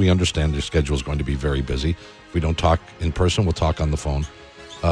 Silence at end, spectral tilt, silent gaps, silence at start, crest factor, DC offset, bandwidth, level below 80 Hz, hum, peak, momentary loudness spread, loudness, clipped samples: 0 s; -6 dB/octave; none; 0 s; 18 dB; under 0.1%; 10.5 kHz; -28 dBFS; none; -4 dBFS; 8 LU; -22 LUFS; under 0.1%